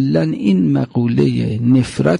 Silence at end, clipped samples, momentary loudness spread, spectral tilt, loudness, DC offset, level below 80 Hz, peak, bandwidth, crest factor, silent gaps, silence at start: 0 s; under 0.1%; 3 LU; -8 dB/octave; -15 LUFS; under 0.1%; -44 dBFS; -2 dBFS; 11 kHz; 12 dB; none; 0 s